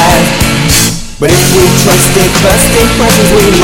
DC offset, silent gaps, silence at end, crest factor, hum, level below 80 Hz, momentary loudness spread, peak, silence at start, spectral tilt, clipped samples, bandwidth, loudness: under 0.1%; none; 0 s; 6 dB; none; -20 dBFS; 3 LU; 0 dBFS; 0 s; -4 dB/octave; 3%; over 20 kHz; -6 LUFS